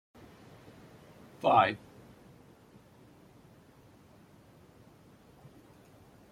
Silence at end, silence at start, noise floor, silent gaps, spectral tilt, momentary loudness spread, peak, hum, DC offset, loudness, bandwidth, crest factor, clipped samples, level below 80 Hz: 4.55 s; 1.45 s; -59 dBFS; none; -6 dB/octave; 31 LU; -10 dBFS; none; under 0.1%; -28 LUFS; 16 kHz; 26 dB; under 0.1%; -70 dBFS